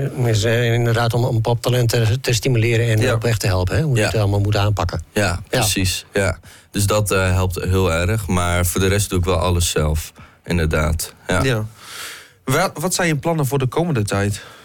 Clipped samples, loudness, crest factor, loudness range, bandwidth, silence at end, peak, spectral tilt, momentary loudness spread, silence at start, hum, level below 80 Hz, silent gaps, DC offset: under 0.1%; -19 LUFS; 10 dB; 3 LU; 18 kHz; 0.05 s; -8 dBFS; -5 dB/octave; 6 LU; 0 s; none; -36 dBFS; none; under 0.1%